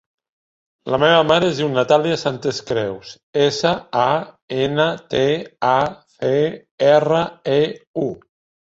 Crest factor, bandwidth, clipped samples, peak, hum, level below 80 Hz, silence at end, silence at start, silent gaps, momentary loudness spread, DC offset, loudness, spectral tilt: 18 dB; 8 kHz; under 0.1%; -2 dBFS; none; -56 dBFS; 0.5 s; 0.85 s; 3.23-3.33 s, 4.42-4.48 s, 6.71-6.78 s, 7.87-7.94 s; 11 LU; under 0.1%; -19 LUFS; -5.5 dB/octave